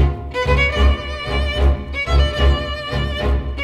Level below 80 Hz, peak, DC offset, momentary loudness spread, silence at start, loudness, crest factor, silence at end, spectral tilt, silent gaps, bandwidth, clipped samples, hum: -18 dBFS; -2 dBFS; under 0.1%; 7 LU; 0 s; -19 LUFS; 14 dB; 0 s; -6 dB/octave; none; 8.2 kHz; under 0.1%; none